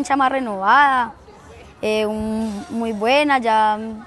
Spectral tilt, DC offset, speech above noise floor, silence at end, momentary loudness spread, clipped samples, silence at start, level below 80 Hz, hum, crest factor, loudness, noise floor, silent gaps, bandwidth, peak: -4.5 dB/octave; under 0.1%; 24 dB; 0 s; 11 LU; under 0.1%; 0 s; -50 dBFS; none; 16 dB; -18 LUFS; -42 dBFS; none; 12.5 kHz; -4 dBFS